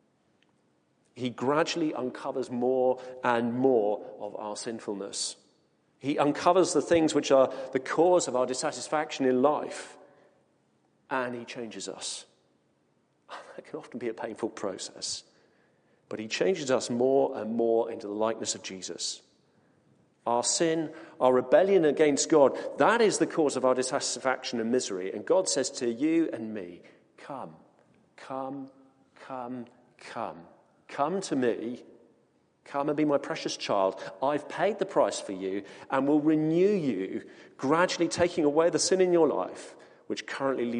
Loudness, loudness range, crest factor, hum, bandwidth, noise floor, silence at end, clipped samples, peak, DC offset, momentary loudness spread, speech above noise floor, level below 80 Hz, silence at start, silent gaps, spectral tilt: -28 LUFS; 13 LU; 22 dB; none; 10 kHz; -70 dBFS; 0 s; under 0.1%; -8 dBFS; under 0.1%; 16 LU; 42 dB; -72 dBFS; 1.15 s; none; -4 dB/octave